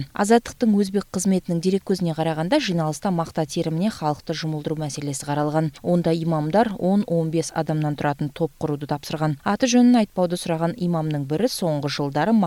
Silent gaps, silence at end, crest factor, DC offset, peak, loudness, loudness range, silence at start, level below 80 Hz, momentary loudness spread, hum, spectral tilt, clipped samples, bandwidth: none; 0 s; 18 dB; under 0.1%; -4 dBFS; -22 LUFS; 3 LU; 0 s; -54 dBFS; 7 LU; none; -6 dB/octave; under 0.1%; 16 kHz